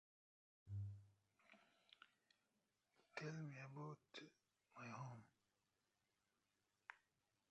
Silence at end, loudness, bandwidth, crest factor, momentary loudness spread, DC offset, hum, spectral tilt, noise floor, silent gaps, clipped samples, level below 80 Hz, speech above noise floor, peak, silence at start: 0.55 s; -57 LUFS; 8.2 kHz; 24 dB; 14 LU; under 0.1%; none; -6 dB/octave; -90 dBFS; none; under 0.1%; -78 dBFS; 35 dB; -36 dBFS; 0.65 s